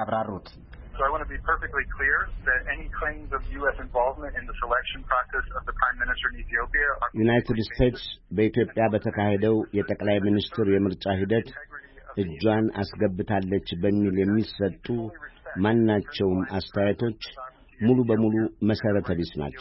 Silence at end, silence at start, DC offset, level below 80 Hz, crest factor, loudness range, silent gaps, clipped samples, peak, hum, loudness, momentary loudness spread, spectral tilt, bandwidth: 0 s; 0 s; under 0.1%; -40 dBFS; 18 dB; 3 LU; none; under 0.1%; -8 dBFS; none; -26 LUFS; 10 LU; -10.5 dB/octave; 5.8 kHz